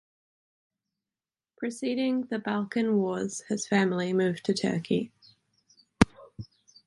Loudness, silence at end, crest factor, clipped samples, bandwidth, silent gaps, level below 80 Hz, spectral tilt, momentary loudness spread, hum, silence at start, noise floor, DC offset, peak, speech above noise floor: -28 LUFS; 0.4 s; 28 dB; under 0.1%; 11.5 kHz; none; -52 dBFS; -5.5 dB/octave; 13 LU; none; 1.6 s; under -90 dBFS; under 0.1%; -2 dBFS; over 62 dB